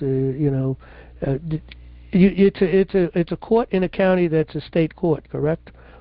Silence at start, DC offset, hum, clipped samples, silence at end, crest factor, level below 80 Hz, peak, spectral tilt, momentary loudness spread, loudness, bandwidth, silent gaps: 0 s; under 0.1%; none; under 0.1%; 0.3 s; 16 dB; -42 dBFS; -4 dBFS; -13 dB/octave; 10 LU; -21 LUFS; 5.2 kHz; none